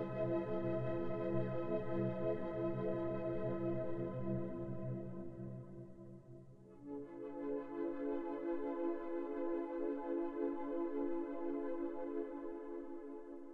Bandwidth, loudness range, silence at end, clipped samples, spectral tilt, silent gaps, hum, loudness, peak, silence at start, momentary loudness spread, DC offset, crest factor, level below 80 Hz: 4.7 kHz; 7 LU; 0 s; under 0.1%; -10.5 dB/octave; none; none; -42 LUFS; -24 dBFS; 0 s; 11 LU; under 0.1%; 16 dB; -64 dBFS